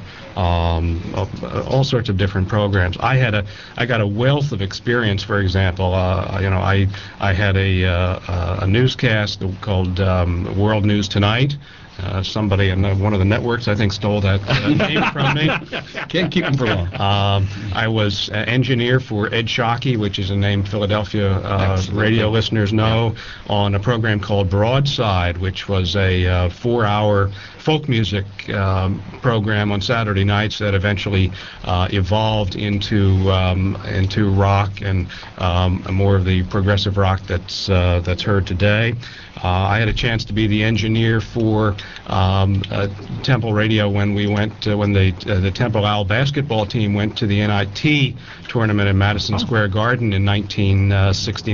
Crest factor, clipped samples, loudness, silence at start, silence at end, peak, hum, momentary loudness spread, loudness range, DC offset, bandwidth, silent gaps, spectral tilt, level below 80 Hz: 14 dB; under 0.1%; -18 LUFS; 0 s; 0 s; -2 dBFS; none; 6 LU; 1 LU; 0.3%; 7.2 kHz; none; -5 dB/octave; -36 dBFS